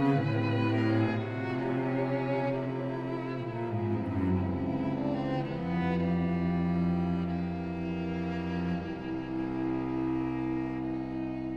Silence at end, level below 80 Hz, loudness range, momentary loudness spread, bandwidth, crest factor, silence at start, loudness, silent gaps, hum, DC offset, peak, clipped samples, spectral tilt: 0 s; -54 dBFS; 3 LU; 6 LU; 6.4 kHz; 16 dB; 0 s; -31 LUFS; none; none; under 0.1%; -16 dBFS; under 0.1%; -9.5 dB/octave